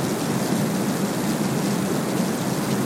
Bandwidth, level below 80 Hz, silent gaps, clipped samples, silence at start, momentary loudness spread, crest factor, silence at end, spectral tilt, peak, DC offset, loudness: 16.5 kHz; -56 dBFS; none; under 0.1%; 0 s; 1 LU; 14 dB; 0 s; -5 dB/octave; -10 dBFS; under 0.1%; -23 LUFS